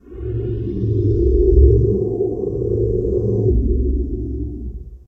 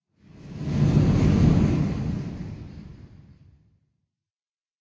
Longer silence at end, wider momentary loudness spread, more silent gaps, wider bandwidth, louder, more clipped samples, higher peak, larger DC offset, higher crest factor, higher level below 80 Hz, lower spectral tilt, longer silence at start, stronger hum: second, 0.1 s vs 1.75 s; second, 13 LU vs 22 LU; neither; second, 1.4 kHz vs 7.8 kHz; first, -19 LUFS vs -22 LUFS; neither; first, 0 dBFS vs -8 dBFS; neither; about the same, 16 dB vs 18 dB; first, -20 dBFS vs -36 dBFS; first, -13 dB/octave vs -8.5 dB/octave; second, 0.05 s vs 0.45 s; neither